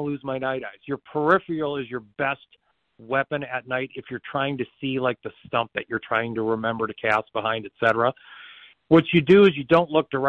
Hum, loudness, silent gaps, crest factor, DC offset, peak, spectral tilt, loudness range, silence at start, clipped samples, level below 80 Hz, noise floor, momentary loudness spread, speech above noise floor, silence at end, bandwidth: none; -23 LUFS; none; 18 dB; under 0.1%; -6 dBFS; -8 dB/octave; 8 LU; 0 s; under 0.1%; -60 dBFS; -47 dBFS; 15 LU; 24 dB; 0 s; 7.2 kHz